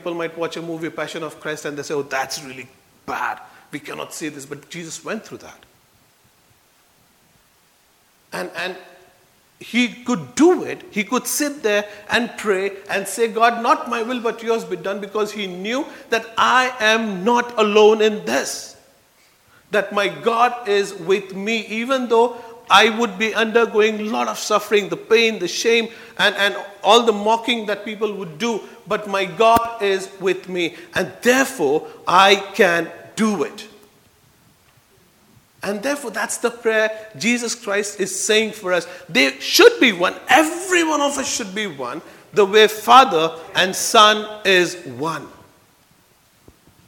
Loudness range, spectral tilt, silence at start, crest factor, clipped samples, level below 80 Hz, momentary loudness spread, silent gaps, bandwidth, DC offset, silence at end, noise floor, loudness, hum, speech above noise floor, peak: 13 LU; -2.5 dB/octave; 0.05 s; 20 dB; under 0.1%; -62 dBFS; 15 LU; none; 18 kHz; under 0.1%; 1.6 s; -57 dBFS; -18 LUFS; none; 39 dB; 0 dBFS